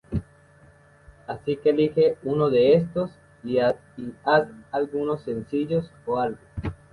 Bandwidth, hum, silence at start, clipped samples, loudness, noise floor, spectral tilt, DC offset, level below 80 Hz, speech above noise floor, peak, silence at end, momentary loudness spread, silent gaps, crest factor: 10.5 kHz; none; 0.1 s; under 0.1%; -24 LUFS; -54 dBFS; -8.5 dB/octave; under 0.1%; -48 dBFS; 31 dB; -6 dBFS; 0.2 s; 15 LU; none; 20 dB